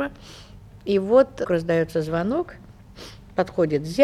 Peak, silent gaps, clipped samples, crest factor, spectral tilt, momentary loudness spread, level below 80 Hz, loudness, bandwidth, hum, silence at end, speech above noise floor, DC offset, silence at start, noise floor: -4 dBFS; none; under 0.1%; 20 dB; -7 dB/octave; 23 LU; -50 dBFS; -23 LUFS; 13.5 kHz; none; 0 s; 21 dB; under 0.1%; 0 s; -43 dBFS